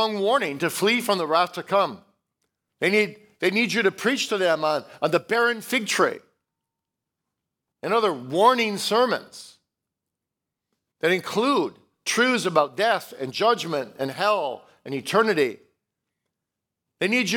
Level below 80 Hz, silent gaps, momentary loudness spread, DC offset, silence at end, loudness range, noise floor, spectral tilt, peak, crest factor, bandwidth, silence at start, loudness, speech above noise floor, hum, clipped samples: -80 dBFS; none; 9 LU; under 0.1%; 0 s; 3 LU; -85 dBFS; -3.5 dB/octave; -4 dBFS; 20 dB; 19 kHz; 0 s; -23 LUFS; 63 dB; none; under 0.1%